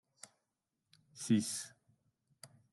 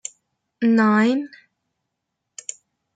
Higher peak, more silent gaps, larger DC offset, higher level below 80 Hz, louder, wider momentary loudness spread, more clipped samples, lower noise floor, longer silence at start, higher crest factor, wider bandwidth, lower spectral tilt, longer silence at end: second, -20 dBFS vs -8 dBFS; neither; neither; second, -88 dBFS vs -74 dBFS; second, -36 LUFS vs -19 LUFS; first, 25 LU vs 21 LU; neither; first, -87 dBFS vs -80 dBFS; first, 1.15 s vs 0.6 s; first, 22 dB vs 16 dB; first, 12.5 kHz vs 9.4 kHz; about the same, -4.5 dB/octave vs -5 dB/octave; second, 0.25 s vs 1.7 s